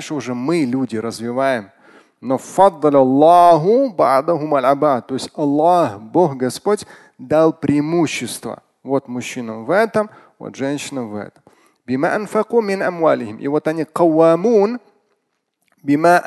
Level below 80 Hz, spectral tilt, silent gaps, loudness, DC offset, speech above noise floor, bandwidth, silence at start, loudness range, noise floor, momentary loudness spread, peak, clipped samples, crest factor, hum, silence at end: -62 dBFS; -6 dB/octave; none; -17 LUFS; under 0.1%; 54 dB; 12.5 kHz; 0 s; 8 LU; -70 dBFS; 14 LU; 0 dBFS; under 0.1%; 16 dB; none; 0 s